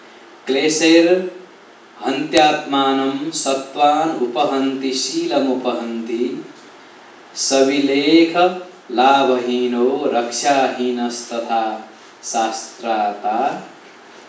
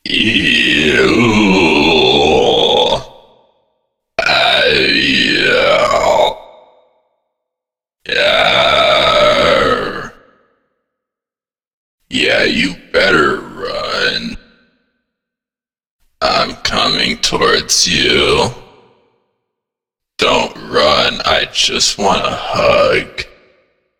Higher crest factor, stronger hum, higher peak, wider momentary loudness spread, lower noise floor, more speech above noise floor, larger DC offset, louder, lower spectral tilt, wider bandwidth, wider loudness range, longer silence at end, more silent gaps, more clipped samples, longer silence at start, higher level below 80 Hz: about the same, 18 dB vs 14 dB; neither; about the same, 0 dBFS vs 0 dBFS; about the same, 12 LU vs 10 LU; second, -44 dBFS vs under -90 dBFS; second, 27 dB vs over 77 dB; neither; second, -17 LUFS vs -11 LUFS; about the same, -3 dB/octave vs -3 dB/octave; second, 8 kHz vs 19 kHz; about the same, 5 LU vs 6 LU; second, 0 s vs 0.75 s; second, none vs 11.73-11.98 s, 15.91-15.99 s; neither; about the same, 0.05 s vs 0.05 s; second, -68 dBFS vs -38 dBFS